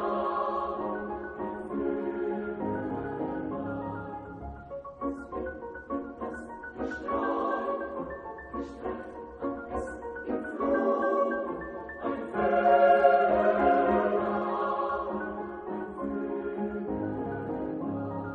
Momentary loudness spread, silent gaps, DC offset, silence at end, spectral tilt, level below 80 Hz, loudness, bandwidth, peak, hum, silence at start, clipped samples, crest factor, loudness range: 15 LU; none; under 0.1%; 0 s; -8 dB/octave; -54 dBFS; -30 LUFS; 9 kHz; -8 dBFS; none; 0 s; under 0.1%; 22 dB; 11 LU